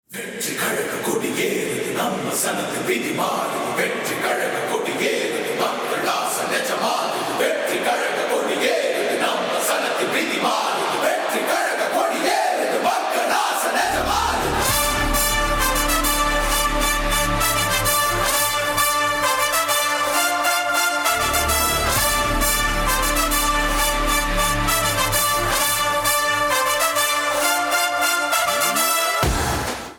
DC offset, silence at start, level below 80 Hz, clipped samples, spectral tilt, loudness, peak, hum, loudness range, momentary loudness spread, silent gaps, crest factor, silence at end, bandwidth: under 0.1%; 0.1 s; -34 dBFS; under 0.1%; -2 dB/octave; -19 LUFS; -6 dBFS; none; 4 LU; 4 LU; none; 14 dB; 0 s; over 20 kHz